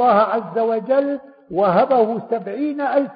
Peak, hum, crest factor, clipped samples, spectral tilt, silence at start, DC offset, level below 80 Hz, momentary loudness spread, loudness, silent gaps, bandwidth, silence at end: -4 dBFS; none; 14 dB; under 0.1%; -11.5 dB/octave; 0 s; under 0.1%; -64 dBFS; 10 LU; -19 LUFS; none; 5.2 kHz; 0 s